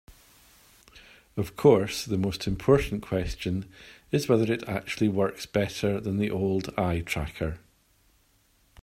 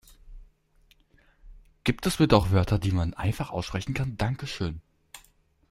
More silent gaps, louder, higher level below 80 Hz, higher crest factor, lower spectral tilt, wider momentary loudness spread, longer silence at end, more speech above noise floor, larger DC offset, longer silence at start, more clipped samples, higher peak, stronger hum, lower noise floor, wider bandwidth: neither; about the same, -27 LUFS vs -27 LUFS; about the same, -46 dBFS vs -44 dBFS; about the same, 22 dB vs 24 dB; about the same, -6 dB/octave vs -6 dB/octave; about the same, 11 LU vs 11 LU; first, 1.25 s vs 0.5 s; about the same, 39 dB vs 37 dB; neither; second, 0.1 s vs 0.25 s; neither; about the same, -6 dBFS vs -4 dBFS; neither; about the same, -65 dBFS vs -63 dBFS; first, 16 kHz vs 14.5 kHz